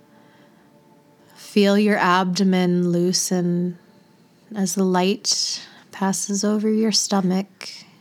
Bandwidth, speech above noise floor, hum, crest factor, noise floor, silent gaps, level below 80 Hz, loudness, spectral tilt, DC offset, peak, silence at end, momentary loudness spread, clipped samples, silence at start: 16 kHz; 34 dB; none; 20 dB; -54 dBFS; none; -80 dBFS; -20 LUFS; -4.5 dB/octave; under 0.1%; -2 dBFS; 0.2 s; 12 LU; under 0.1%; 1.4 s